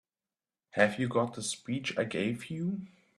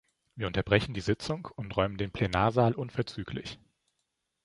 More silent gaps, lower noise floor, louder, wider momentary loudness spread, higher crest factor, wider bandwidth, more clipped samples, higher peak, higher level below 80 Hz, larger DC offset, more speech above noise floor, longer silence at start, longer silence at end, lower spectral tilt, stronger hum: neither; first, under -90 dBFS vs -81 dBFS; about the same, -32 LUFS vs -30 LUFS; second, 8 LU vs 12 LU; about the same, 24 dB vs 24 dB; first, 13 kHz vs 11.5 kHz; neither; second, -10 dBFS vs -6 dBFS; second, -72 dBFS vs -50 dBFS; neither; first, over 58 dB vs 52 dB; first, 0.75 s vs 0.35 s; second, 0.3 s vs 0.9 s; second, -5 dB/octave vs -6.5 dB/octave; neither